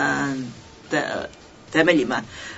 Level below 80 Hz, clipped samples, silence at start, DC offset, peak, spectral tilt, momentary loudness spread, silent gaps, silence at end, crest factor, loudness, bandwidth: -56 dBFS; under 0.1%; 0 s; under 0.1%; -2 dBFS; -4.5 dB/octave; 18 LU; none; 0 s; 22 dB; -23 LUFS; 8 kHz